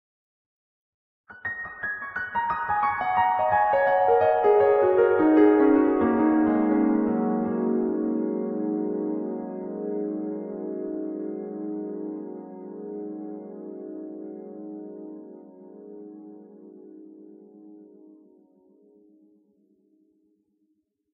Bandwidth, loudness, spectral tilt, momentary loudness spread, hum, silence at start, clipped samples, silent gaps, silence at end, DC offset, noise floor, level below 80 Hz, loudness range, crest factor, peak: 4 kHz; -24 LUFS; -10 dB/octave; 20 LU; none; 1.3 s; under 0.1%; none; 3.25 s; under 0.1%; -73 dBFS; -62 dBFS; 21 LU; 18 dB; -8 dBFS